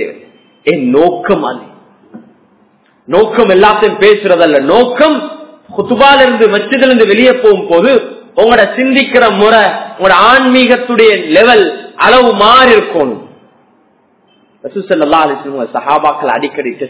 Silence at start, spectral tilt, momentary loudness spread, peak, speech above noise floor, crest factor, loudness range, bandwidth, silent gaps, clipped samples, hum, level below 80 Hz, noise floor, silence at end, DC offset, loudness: 0 s; -8.5 dB/octave; 12 LU; 0 dBFS; 43 dB; 8 dB; 7 LU; 4 kHz; none; 5%; none; -44 dBFS; -50 dBFS; 0 s; under 0.1%; -8 LUFS